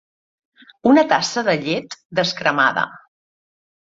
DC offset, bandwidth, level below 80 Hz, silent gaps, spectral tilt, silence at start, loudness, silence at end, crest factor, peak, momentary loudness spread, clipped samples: under 0.1%; 7.8 kHz; -62 dBFS; 2.05-2.10 s; -4 dB/octave; 0.85 s; -18 LUFS; 1 s; 18 dB; -2 dBFS; 10 LU; under 0.1%